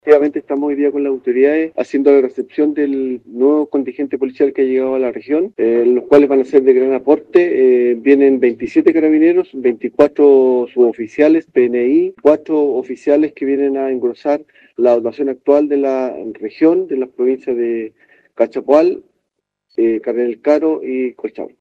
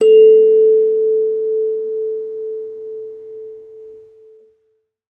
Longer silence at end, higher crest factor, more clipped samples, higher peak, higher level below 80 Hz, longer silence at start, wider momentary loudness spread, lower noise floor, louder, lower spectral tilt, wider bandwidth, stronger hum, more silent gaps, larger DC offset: second, 0.15 s vs 1.2 s; about the same, 14 dB vs 14 dB; neither; about the same, 0 dBFS vs -2 dBFS; first, -62 dBFS vs -76 dBFS; about the same, 0.05 s vs 0 s; second, 9 LU vs 24 LU; first, -75 dBFS vs -65 dBFS; about the same, -14 LUFS vs -14 LUFS; first, -7.5 dB/octave vs -5 dB/octave; first, 6.6 kHz vs 3 kHz; neither; neither; neither